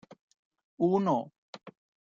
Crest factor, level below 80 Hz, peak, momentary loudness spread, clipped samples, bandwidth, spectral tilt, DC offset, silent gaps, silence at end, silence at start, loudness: 18 dB; -76 dBFS; -14 dBFS; 23 LU; under 0.1%; 7.4 kHz; -8.5 dB/octave; under 0.1%; 1.38-1.53 s; 0.4 s; 0.8 s; -29 LUFS